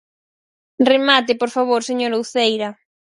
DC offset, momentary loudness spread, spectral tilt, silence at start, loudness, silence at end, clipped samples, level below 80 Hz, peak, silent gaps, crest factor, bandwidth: under 0.1%; 7 LU; -3 dB/octave; 0.8 s; -17 LUFS; 0.4 s; under 0.1%; -70 dBFS; 0 dBFS; none; 18 dB; 11.5 kHz